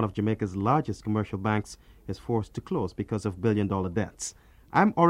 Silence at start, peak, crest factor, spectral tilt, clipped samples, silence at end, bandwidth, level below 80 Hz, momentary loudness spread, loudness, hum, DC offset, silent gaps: 0 s; -6 dBFS; 20 dB; -6.5 dB/octave; under 0.1%; 0 s; 12 kHz; -54 dBFS; 11 LU; -29 LUFS; none; under 0.1%; none